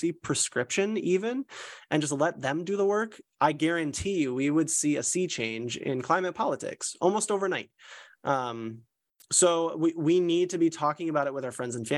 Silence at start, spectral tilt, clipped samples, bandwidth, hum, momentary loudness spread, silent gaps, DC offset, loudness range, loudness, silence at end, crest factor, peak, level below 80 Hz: 0 s; -4 dB/octave; under 0.1%; 12.5 kHz; none; 10 LU; none; under 0.1%; 3 LU; -28 LUFS; 0 s; 18 dB; -10 dBFS; -64 dBFS